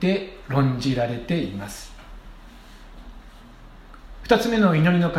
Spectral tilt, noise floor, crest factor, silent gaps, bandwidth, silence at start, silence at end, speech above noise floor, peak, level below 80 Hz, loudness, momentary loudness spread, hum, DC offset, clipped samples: -6.5 dB/octave; -44 dBFS; 22 dB; none; 15 kHz; 0 s; 0 s; 23 dB; -2 dBFS; -44 dBFS; -22 LUFS; 21 LU; none; under 0.1%; under 0.1%